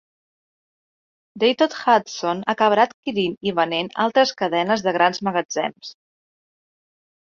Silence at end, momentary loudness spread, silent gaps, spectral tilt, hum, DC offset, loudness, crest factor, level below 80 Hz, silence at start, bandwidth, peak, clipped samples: 1.3 s; 8 LU; 2.94-3.03 s, 3.37-3.41 s, 5.45-5.49 s; -4 dB/octave; none; under 0.1%; -20 LUFS; 20 dB; -66 dBFS; 1.35 s; 7.4 kHz; -2 dBFS; under 0.1%